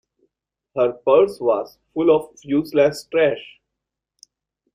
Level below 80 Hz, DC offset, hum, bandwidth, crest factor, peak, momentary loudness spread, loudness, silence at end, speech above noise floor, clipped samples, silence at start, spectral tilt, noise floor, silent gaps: -60 dBFS; under 0.1%; none; 15.5 kHz; 18 dB; -2 dBFS; 9 LU; -19 LUFS; 1.3 s; 64 dB; under 0.1%; 0.75 s; -6 dB/octave; -83 dBFS; none